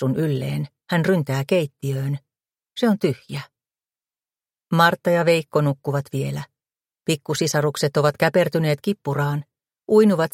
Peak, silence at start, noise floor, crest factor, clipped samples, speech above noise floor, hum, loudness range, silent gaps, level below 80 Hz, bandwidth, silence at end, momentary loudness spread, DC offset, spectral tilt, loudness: -2 dBFS; 0 s; under -90 dBFS; 20 dB; under 0.1%; over 70 dB; none; 3 LU; none; -62 dBFS; 16.5 kHz; 0.05 s; 12 LU; under 0.1%; -6 dB/octave; -21 LUFS